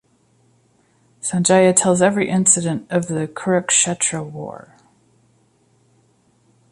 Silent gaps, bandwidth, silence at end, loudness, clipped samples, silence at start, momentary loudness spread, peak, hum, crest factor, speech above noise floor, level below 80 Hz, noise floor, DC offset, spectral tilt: none; 11.5 kHz; 2.15 s; -17 LUFS; under 0.1%; 1.25 s; 14 LU; 0 dBFS; none; 20 dB; 41 dB; -60 dBFS; -59 dBFS; under 0.1%; -4 dB/octave